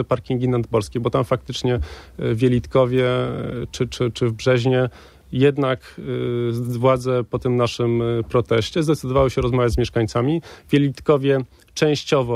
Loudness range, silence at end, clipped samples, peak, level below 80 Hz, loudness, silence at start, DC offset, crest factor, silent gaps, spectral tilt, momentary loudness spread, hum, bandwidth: 2 LU; 0 s; under 0.1%; -4 dBFS; -40 dBFS; -21 LUFS; 0 s; under 0.1%; 16 dB; none; -6.5 dB/octave; 8 LU; none; 13.5 kHz